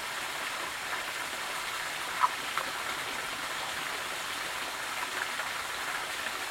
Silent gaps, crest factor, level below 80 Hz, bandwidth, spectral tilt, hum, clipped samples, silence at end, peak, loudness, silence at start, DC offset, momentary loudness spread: none; 24 dB; -66 dBFS; 16.5 kHz; 0 dB/octave; none; under 0.1%; 0 s; -10 dBFS; -33 LUFS; 0 s; under 0.1%; 4 LU